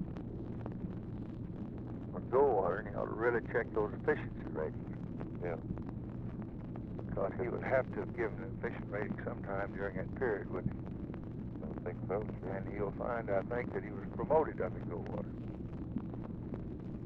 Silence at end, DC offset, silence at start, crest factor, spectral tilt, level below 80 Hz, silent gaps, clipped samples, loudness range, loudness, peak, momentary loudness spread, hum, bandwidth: 0 s; under 0.1%; 0 s; 20 dB; -10.5 dB/octave; -52 dBFS; none; under 0.1%; 5 LU; -38 LUFS; -18 dBFS; 11 LU; none; 5.6 kHz